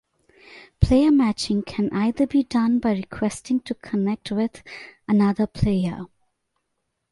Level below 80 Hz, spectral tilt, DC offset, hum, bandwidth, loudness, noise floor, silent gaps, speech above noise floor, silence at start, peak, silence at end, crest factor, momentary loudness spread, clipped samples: -38 dBFS; -7 dB/octave; under 0.1%; none; 11.5 kHz; -22 LUFS; -77 dBFS; none; 55 dB; 0.5 s; -2 dBFS; 1.05 s; 20 dB; 10 LU; under 0.1%